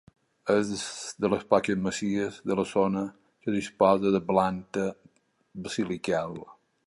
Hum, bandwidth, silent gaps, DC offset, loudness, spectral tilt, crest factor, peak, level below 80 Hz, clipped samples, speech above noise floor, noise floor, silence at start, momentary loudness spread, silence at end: none; 11.5 kHz; none; under 0.1%; -28 LUFS; -5.5 dB/octave; 22 dB; -6 dBFS; -60 dBFS; under 0.1%; 36 dB; -63 dBFS; 0.45 s; 12 LU; 0.35 s